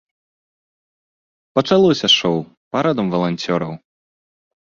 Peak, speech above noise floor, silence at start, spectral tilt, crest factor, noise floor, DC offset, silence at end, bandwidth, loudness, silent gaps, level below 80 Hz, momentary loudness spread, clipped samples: -2 dBFS; over 73 dB; 1.55 s; -5 dB/octave; 18 dB; under -90 dBFS; under 0.1%; 0.95 s; 7.4 kHz; -17 LUFS; 2.57-2.71 s; -58 dBFS; 11 LU; under 0.1%